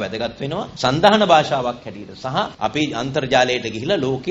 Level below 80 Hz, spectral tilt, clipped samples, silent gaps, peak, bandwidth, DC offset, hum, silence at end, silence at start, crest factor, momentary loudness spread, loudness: -50 dBFS; -5 dB/octave; under 0.1%; none; 0 dBFS; 8.6 kHz; under 0.1%; none; 0 s; 0 s; 20 dB; 12 LU; -19 LUFS